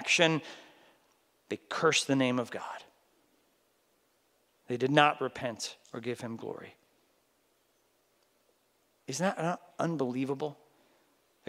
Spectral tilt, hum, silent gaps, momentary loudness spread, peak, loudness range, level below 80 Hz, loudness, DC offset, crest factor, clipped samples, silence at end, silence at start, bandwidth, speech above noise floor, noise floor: -4 dB/octave; none; none; 19 LU; -6 dBFS; 10 LU; -80 dBFS; -31 LUFS; under 0.1%; 28 dB; under 0.1%; 0.95 s; 0 s; 16 kHz; 41 dB; -72 dBFS